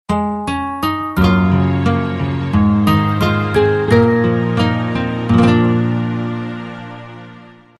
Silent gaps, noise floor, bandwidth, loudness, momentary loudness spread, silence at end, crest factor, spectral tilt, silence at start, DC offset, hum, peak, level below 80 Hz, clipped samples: none; -40 dBFS; 13.5 kHz; -15 LUFS; 13 LU; 0.3 s; 14 dB; -7.5 dB/octave; 0.1 s; under 0.1%; none; 0 dBFS; -34 dBFS; under 0.1%